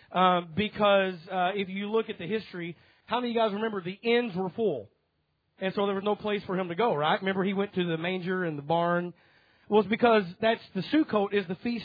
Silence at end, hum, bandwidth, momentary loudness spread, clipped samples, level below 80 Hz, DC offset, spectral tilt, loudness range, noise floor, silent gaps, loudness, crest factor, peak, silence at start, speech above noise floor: 0 s; none; 5 kHz; 9 LU; under 0.1%; -70 dBFS; under 0.1%; -8.5 dB/octave; 3 LU; -75 dBFS; none; -28 LUFS; 18 dB; -10 dBFS; 0.1 s; 48 dB